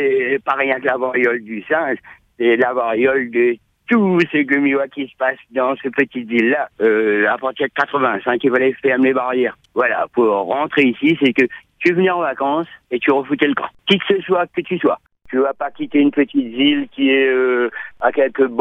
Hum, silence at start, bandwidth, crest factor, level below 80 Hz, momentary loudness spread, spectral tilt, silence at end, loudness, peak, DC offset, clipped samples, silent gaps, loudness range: none; 0 s; 7 kHz; 16 dB; -62 dBFS; 6 LU; -7 dB/octave; 0 s; -17 LUFS; 0 dBFS; under 0.1%; under 0.1%; none; 1 LU